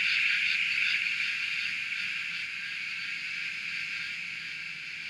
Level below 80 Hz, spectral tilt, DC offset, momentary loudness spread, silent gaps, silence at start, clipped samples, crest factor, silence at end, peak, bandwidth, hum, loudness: -74 dBFS; 1 dB/octave; under 0.1%; 10 LU; none; 0 s; under 0.1%; 18 dB; 0 s; -14 dBFS; 15 kHz; none; -29 LUFS